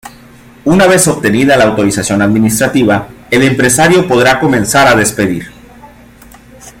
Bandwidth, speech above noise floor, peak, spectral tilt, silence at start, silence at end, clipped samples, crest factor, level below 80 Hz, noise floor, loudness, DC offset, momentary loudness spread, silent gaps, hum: 17 kHz; 28 dB; 0 dBFS; -4.5 dB/octave; 0.05 s; 0.1 s; under 0.1%; 10 dB; -38 dBFS; -37 dBFS; -9 LUFS; under 0.1%; 7 LU; none; none